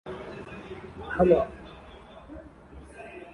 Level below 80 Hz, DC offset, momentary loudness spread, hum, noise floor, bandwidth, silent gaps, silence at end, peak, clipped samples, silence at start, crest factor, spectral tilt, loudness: -50 dBFS; under 0.1%; 26 LU; none; -48 dBFS; 11 kHz; none; 0.05 s; -8 dBFS; under 0.1%; 0.05 s; 22 dB; -8 dB/octave; -26 LUFS